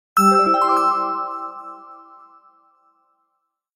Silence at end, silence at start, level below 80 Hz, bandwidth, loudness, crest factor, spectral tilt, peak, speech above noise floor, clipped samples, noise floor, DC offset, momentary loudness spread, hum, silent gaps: 1.8 s; 0.15 s; -70 dBFS; 16 kHz; -17 LUFS; 18 dB; -5 dB/octave; -4 dBFS; 58 dB; under 0.1%; -74 dBFS; under 0.1%; 22 LU; none; none